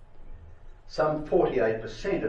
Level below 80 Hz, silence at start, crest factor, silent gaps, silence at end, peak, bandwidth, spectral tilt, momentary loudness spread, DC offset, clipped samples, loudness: -46 dBFS; 0 s; 18 dB; none; 0 s; -10 dBFS; 8.4 kHz; -7 dB/octave; 8 LU; under 0.1%; under 0.1%; -27 LUFS